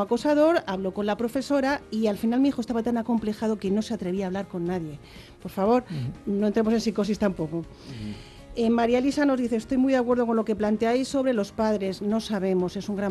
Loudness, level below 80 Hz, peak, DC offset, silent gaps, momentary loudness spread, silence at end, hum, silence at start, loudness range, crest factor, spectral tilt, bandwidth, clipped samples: -25 LUFS; -52 dBFS; -10 dBFS; under 0.1%; none; 11 LU; 0 s; none; 0 s; 4 LU; 16 dB; -6.5 dB/octave; 12.5 kHz; under 0.1%